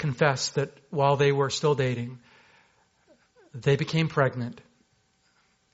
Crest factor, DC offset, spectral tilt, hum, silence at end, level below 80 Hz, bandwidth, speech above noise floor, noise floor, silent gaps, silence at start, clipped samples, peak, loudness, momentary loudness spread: 22 dB; under 0.1%; -5 dB/octave; none; 1.15 s; -62 dBFS; 8 kHz; 43 dB; -68 dBFS; none; 0 s; under 0.1%; -6 dBFS; -26 LUFS; 13 LU